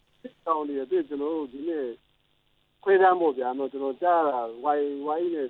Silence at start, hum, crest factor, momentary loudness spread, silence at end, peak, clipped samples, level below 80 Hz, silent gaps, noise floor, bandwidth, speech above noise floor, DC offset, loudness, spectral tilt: 0.25 s; none; 18 dB; 11 LU; 0 s; -8 dBFS; under 0.1%; -72 dBFS; none; -68 dBFS; 4.1 kHz; 43 dB; under 0.1%; -26 LUFS; -8 dB/octave